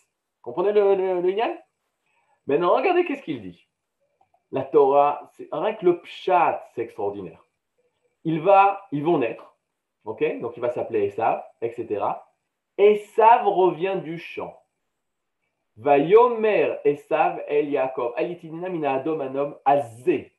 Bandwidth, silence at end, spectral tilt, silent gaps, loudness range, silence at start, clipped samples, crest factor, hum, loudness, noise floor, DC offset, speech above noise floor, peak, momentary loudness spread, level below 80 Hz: 11.5 kHz; 0.15 s; -7.5 dB/octave; none; 5 LU; 0.45 s; under 0.1%; 18 dB; none; -22 LUFS; -81 dBFS; under 0.1%; 59 dB; -4 dBFS; 17 LU; -78 dBFS